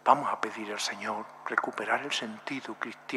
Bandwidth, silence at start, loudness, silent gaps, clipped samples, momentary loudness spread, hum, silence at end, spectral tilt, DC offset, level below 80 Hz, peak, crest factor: 15 kHz; 0.05 s; -32 LUFS; none; under 0.1%; 10 LU; none; 0 s; -2.5 dB/octave; under 0.1%; -88 dBFS; -6 dBFS; 26 dB